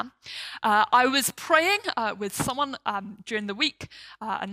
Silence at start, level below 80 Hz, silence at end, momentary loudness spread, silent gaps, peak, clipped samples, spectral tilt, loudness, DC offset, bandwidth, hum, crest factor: 0 s; -62 dBFS; 0 s; 16 LU; none; -6 dBFS; under 0.1%; -2.5 dB/octave; -25 LUFS; under 0.1%; 16 kHz; none; 20 dB